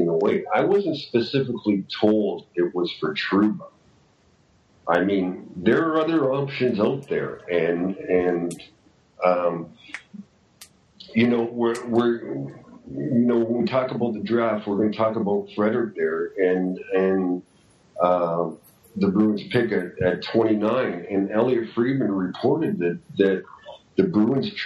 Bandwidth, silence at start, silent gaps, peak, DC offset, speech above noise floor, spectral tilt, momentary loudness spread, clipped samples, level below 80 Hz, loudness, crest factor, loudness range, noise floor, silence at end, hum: 12 kHz; 0 s; none; -4 dBFS; under 0.1%; 37 dB; -7.5 dB/octave; 8 LU; under 0.1%; -62 dBFS; -23 LUFS; 20 dB; 3 LU; -59 dBFS; 0 s; none